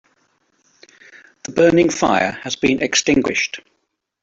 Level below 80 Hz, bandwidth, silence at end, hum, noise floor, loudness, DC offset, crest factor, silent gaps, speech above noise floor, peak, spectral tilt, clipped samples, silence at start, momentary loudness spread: -50 dBFS; 8 kHz; 0.65 s; none; -71 dBFS; -17 LUFS; under 0.1%; 16 dB; none; 54 dB; -2 dBFS; -3.5 dB/octave; under 0.1%; 1.45 s; 11 LU